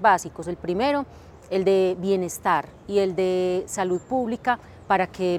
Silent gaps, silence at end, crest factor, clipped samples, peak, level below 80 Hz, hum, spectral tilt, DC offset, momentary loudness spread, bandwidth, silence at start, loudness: none; 0 s; 18 dB; under 0.1%; -6 dBFS; -56 dBFS; none; -5 dB/octave; under 0.1%; 7 LU; 14 kHz; 0 s; -24 LUFS